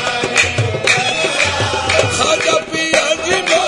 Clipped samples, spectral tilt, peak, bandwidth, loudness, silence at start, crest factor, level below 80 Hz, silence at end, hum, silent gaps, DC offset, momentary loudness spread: under 0.1%; -2.5 dB/octave; 0 dBFS; 12 kHz; -14 LUFS; 0 s; 16 dB; -46 dBFS; 0 s; none; none; under 0.1%; 2 LU